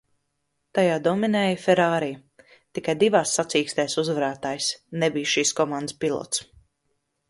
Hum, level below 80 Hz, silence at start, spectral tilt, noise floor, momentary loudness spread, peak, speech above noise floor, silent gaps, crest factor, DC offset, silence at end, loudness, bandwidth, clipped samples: none; -66 dBFS; 0.75 s; -3.5 dB/octave; -76 dBFS; 9 LU; -6 dBFS; 53 dB; none; 20 dB; under 0.1%; 0.85 s; -23 LUFS; 11.5 kHz; under 0.1%